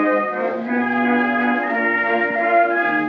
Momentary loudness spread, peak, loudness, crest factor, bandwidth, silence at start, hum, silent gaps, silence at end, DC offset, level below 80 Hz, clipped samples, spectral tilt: 5 LU; -4 dBFS; -18 LUFS; 14 dB; 5.8 kHz; 0 s; none; none; 0 s; under 0.1%; -80 dBFS; under 0.1%; -2.5 dB/octave